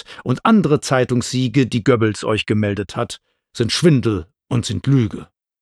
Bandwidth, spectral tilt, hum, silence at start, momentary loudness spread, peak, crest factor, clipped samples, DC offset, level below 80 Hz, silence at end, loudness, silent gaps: 12.5 kHz; -6 dB/octave; none; 0.1 s; 11 LU; -2 dBFS; 16 dB; under 0.1%; under 0.1%; -50 dBFS; 0.35 s; -18 LUFS; none